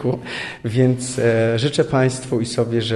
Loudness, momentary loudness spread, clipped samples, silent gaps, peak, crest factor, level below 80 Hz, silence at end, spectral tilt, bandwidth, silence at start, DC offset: -19 LUFS; 7 LU; under 0.1%; none; -4 dBFS; 14 dB; -50 dBFS; 0 s; -5.5 dB/octave; 11.5 kHz; 0 s; under 0.1%